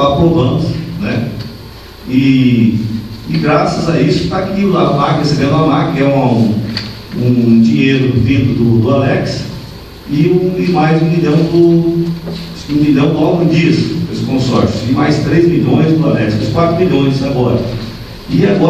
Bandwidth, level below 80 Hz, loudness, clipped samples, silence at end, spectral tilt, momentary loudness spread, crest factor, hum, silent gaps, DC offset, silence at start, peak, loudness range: 14 kHz; -34 dBFS; -12 LUFS; under 0.1%; 0 s; -7.5 dB/octave; 12 LU; 12 dB; none; none; under 0.1%; 0 s; 0 dBFS; 2 LU